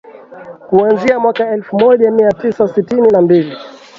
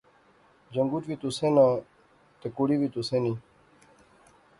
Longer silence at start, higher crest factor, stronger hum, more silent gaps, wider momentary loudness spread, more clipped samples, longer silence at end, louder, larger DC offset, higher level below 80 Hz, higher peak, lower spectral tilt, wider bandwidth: second, 0.05 s vs 0.7 s; second, 12 dB vs 20 dB; neither; neither; second, 7 LU vs 15 LU; neither; second, 0.3 s vs 1.2 s; first, -12 LUFS vs -27 LUFS; neither; first, -54 dBFS vs -66 dBFS; first, 0 dBFS vs -8 dBFS; about the same, -8 dB/octave vs -7 dB/octave; second, 7.4 kHz vs 11.5 kHz